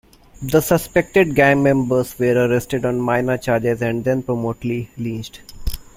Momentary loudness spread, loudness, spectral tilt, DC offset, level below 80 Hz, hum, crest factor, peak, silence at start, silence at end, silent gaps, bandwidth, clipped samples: 15 LU; -18 LUFS; -6 dB/octave; under 0.1%; -38 dBFS; none; 18 dB; -2 dBFS; 0.4 s; 0.15 s; none; 16.5 kHz; under 0.1%